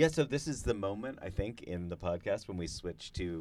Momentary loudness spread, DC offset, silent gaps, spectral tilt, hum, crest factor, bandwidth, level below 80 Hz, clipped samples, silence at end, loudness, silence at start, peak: 7 LU; under 0.1%; none; -5.5 dB/octave; none; 22 dB; 13.5 kHz; -50 dBFS; under 0.1%; 0 s; -37 LUFS; 0 s; -14 dBFS